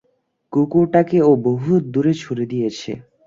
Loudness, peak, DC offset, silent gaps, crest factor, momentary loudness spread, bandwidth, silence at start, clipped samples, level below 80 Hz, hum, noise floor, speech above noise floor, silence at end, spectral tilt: -18 LUFS; -2 dBFS; under 0.1%; none; 16 dB; 10 LU; 7.6 kHz; 0.5 s; under 0.1%; -56 dBFS; none; -66 dBFS; 49 dB; 0.25 s; -8 dB/octave